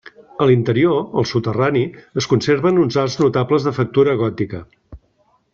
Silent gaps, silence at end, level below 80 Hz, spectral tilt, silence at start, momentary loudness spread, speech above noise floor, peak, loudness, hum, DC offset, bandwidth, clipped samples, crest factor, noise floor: none; 0.55 s; -52 dBFS; -6.5 dB/octave; 0.4 s; 9 LU; 44 dB; -2 dBFS; -17 LUFS; none; under 0.1%; 7.4 kHz; under 0.1%; 16 dB; -60 dBFS